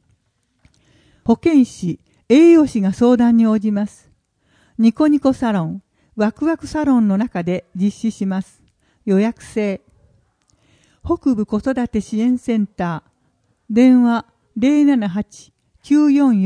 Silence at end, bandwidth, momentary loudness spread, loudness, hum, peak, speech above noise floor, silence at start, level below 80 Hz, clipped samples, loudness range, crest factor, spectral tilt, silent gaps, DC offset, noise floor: 0 s; 10.5 kHz; 14 LU; -17 LUFS; none; 0 dBFS; 51 dB; 1.25 s; -48 dBFS; under 0.1%; 7 LU; 16 dB; -7.5 dB/octave; none; under 0.1%; -66 dBFS